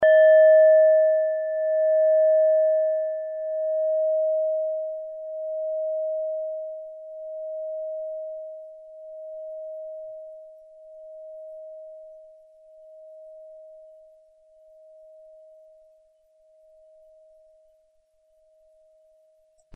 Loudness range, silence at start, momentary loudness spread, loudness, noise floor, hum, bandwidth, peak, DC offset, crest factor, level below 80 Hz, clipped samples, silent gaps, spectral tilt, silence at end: 24 LU; 0 s; 27 LU; -22 LUFS; -66 dBFS; none; 3.4 kHz; -10 dBFS; under 0.1%; 16 dB; -76 dBFS; under 0.1%; none; -5 dB/octave; 6 s